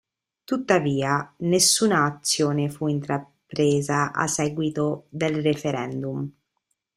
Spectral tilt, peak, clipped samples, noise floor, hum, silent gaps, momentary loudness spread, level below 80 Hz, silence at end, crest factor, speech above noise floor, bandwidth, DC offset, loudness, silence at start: -4 dB/octave; -6 dBFS; under 0.1%; -77 dBFS; none; none; 11 LU; -62 dBFS; 0.65 s; 18 dB; 53 dB; 15.5 kHz; under 0.1%; -23 LUFS; 0.5 s